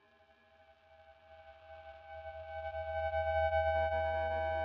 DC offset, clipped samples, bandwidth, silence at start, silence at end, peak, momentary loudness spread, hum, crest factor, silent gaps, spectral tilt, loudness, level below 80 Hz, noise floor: under 0.1%; under 0.1%; 5.4 kHz; 0.9 s; 0 s; -22 dBFS; 22 LU; none; 16 dB; none; -7 dB/octave; -35 LUFS; -54 dBFS; -67 dBFS